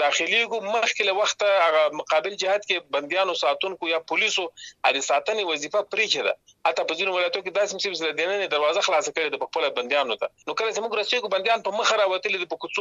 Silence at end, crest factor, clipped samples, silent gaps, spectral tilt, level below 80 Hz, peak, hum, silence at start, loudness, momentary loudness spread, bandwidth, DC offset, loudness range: 0 s; 18 dB; under 0.1%; none; -0.5 dB/octave; -76 dBFS; -6 dBFS; none; 0 s; -23 LUFS; 5 LU; 8.6 kHz; under 0.1%; 2 LU